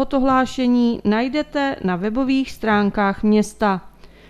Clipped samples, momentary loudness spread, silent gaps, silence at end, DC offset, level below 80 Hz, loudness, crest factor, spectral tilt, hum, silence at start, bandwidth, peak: under 0.1%; 4 LU; none; 0.25 s; under 0.1%; -44 dBFS; -19 LUFS; 16 dB; -6 dB/octave; none; 0 s; 13 kHz; -4 dBFS